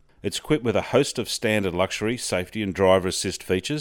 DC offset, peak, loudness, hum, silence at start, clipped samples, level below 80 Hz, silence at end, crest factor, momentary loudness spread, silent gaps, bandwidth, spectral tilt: under 0.1%; -4 dBFS; -24 LUFS; none; 0.25 s; under 0.1%; -52 dBFS; 0 s; 20 dB; 7 LU; none; 18 kHz; -4.5 dB/octave